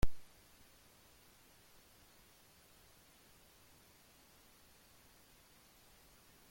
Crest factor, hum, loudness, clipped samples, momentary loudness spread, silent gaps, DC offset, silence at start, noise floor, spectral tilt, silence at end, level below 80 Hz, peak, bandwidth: 24 dB; none; -61 LUFS; under 0.1%; 0 LU; none; under 0.1%; 0.05 s; -65 dBFS; -5 dB/octave; 6.3 s; -54 dBFS; -18 dBFS; 16.5 kHz